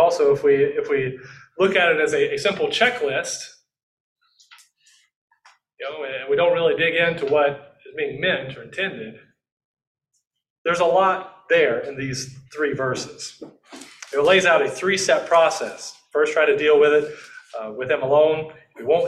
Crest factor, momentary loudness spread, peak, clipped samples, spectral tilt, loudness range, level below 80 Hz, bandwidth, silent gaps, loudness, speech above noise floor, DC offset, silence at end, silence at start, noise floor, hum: 18 dB; 18 LU; -4 dBFS; under 0.1%; -3.5 dB/octave; 7 LU; -62 dBFS; 12.5 kHz; 3.83-4.16 s, 5.16-5.28 s, 9.52-9.57 s, 9.64-9.74 s, 9.87-9.95 s, 10.50-10.65 s; -20 LUFS; 39 dB; under 0.1%; 0 s; 0 s; -59 dBFS; none